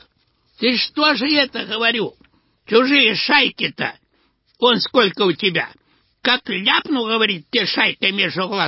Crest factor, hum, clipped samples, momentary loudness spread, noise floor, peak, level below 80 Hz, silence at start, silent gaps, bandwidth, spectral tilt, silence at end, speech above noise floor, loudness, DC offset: 18 dB; none; under 0.1%; 8 LU; -63 dBFS; 0 dBFS; -64 dBFS; 0.6 s; none; 5.8 kHz; -7.5 dB/octave; 0 s; 45 dB; -17 LUFS; under 0.1%